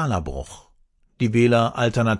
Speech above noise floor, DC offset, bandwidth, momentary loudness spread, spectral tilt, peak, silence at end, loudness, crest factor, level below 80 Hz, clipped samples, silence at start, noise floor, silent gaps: 39 dB; under 0.1%; 11.5 kHz; 17 LU; -6.5 dB/octave; -6 dBFS; 0 s; -20 LUFS; 16 dB; -42 dBFS; under 0.1%; 0 s; -59 dBFS; none